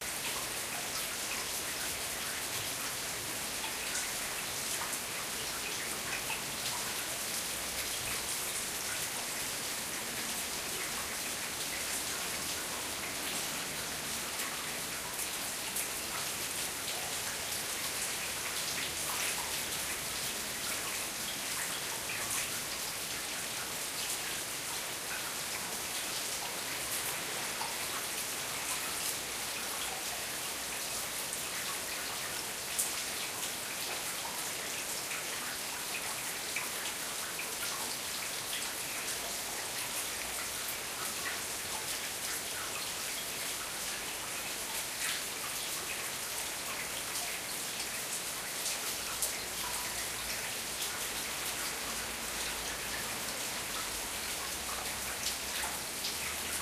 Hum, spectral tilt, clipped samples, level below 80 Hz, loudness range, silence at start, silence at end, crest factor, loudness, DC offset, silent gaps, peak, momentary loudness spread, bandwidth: none; 0 dB/octave; under 0.1%; -62 dBFS; 1 LU; 0 s; 0 s; 24 dB; -35 LUFS; under 0.1%; none; -14 dBFS; 2 LU; 15.5 kHz